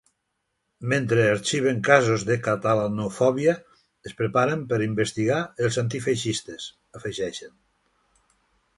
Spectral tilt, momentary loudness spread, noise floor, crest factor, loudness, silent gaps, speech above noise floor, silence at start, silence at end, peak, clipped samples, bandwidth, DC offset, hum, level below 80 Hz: -5 dB/octave; 16 LU; -77 dBFS; 22 dB; -24 LUFS; none; 54 dB; 0.8 s; 1.3 s; -2 dBFS; under 0.1%; 11.5 kHz; under 0.1%; none; -60 dBFS